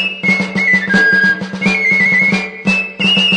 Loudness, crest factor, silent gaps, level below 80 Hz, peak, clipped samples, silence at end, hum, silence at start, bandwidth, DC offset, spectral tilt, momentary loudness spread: -11 LUFS; 14 dB; none; -50 dBFS; 0 dBFS; under 0.1%; 0 s; none; 0 s; 10 kHz; under 0.1%; -4 dB/octave; 6 LU